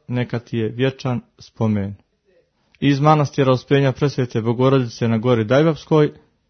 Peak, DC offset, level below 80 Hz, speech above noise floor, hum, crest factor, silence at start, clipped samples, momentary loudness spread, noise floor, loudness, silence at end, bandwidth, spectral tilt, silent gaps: 0 dBFS; under 0.1%; -54 dBFS; 43 dB; none; 18 dB; 0.1 s; under 0.1%; 9 LU; -61 dBFS; -19 LUFS; 0.4 s; 6.6 kHz; -7.5 dB/octave; none